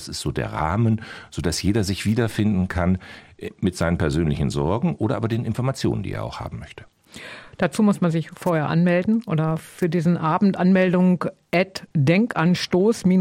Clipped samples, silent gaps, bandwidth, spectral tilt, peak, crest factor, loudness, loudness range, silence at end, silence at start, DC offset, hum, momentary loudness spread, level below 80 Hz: under 0.1%; none; 15.5 kHz; -6.5 dB/octave; -6 dBFS; 16 dB; -22 LUFS; 5 LU; 0 s; 0 s; under 0.1%; none; 12 LU; -42 dBFS